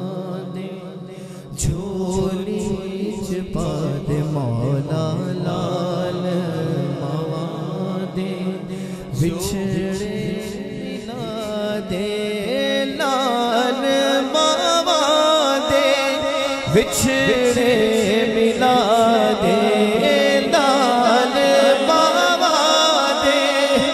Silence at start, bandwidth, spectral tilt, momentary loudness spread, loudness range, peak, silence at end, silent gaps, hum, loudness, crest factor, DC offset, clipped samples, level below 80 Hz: 0 s; 15 kHz; -4.5 dB/octave; 12 LU; 9 LU; -2 dBFS; 0 s; none; none; -18 LUFS; 18 dB; under 0.1%; under 0.1%; -44 dBFS